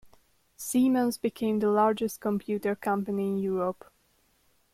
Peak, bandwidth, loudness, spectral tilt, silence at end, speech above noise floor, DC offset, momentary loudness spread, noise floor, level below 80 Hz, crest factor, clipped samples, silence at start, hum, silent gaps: -12 dBFS; 16 kHz; -28 LUFS; -6 dB/octave; 1 s; 41 dB; under 0.1%; 7 LU; -68 dBFS; -68 dBFS; 16 dB; under 0.1%; 0.05 s; none; none